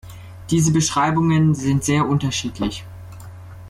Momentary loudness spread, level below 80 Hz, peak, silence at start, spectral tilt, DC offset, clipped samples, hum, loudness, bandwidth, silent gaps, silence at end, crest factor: 21 LU; -44 dBFS; -6 dBFS; 0.05 s; -5 dB/octave; under 0.1%; under 0.1%; none; -19 LUFS; 14 kHz; none; 0 s; 14 dB